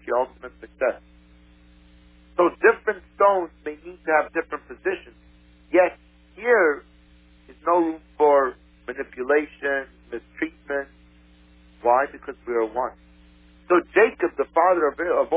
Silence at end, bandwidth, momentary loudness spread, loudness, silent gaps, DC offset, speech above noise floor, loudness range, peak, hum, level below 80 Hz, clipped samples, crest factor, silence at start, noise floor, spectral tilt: 0 s; 4 kHz; 16 LU; -23 LUFS; none; under 0.1%; 31 dB; 5 LU; -4 dBFS; none; -54 dBFS; under 0.1%; 20 dB; 0.05 s; -53 dBFS; -8.5 dB/octave